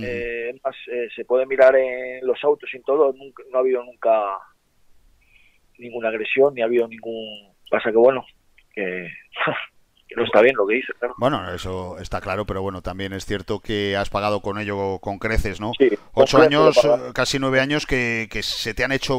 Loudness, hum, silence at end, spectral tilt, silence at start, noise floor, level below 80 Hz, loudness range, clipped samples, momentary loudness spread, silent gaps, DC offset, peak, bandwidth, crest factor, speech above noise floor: -21 LUFS; none; 0 s; -5 dB/octave; 0 s; -56 dBFS; -42 dBFS; 7 LU; under 0.1%; 15 LU; none; under 0.1%; 0 dBFS; 16 kHz; 20 dB; 35 dB